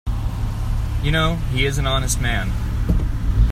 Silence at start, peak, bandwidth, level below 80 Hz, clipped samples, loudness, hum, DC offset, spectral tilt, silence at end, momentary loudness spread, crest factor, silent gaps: 0.05 s; -4 dBFS; 15.5 kHz; -22 dBFS; under 0.1%; -21 LUFS; none; under 0.1%; -4.5 dB/octave; 0 s; 6 LU; 16 dB; none